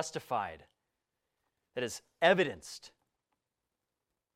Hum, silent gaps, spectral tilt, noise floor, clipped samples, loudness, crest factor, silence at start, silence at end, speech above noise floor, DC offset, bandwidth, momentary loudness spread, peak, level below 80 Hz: none; none; -3.5 dB/octave; -88 dBFS; under 0.1%; -32 LUFS; 26 dB; 0 s; 1.5 s; 54 dB; under 0.1%; 16 kHz; 19 LU; -12 dBFS; -76 dBFS